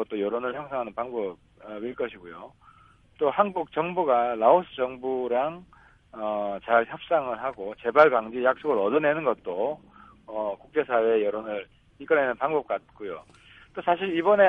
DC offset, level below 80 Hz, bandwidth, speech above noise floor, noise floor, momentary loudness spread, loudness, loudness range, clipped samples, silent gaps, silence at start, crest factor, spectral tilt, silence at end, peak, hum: under 0.1%; -64 dBFS; 5.6 kHz; 31 dB; -57 dBFS; 17 LU; -26 LUFS; 5 LU; under 0.1%; none; 0 s; 22 dB; -7.5 dB/octave; 0 s; -4 dBFS; none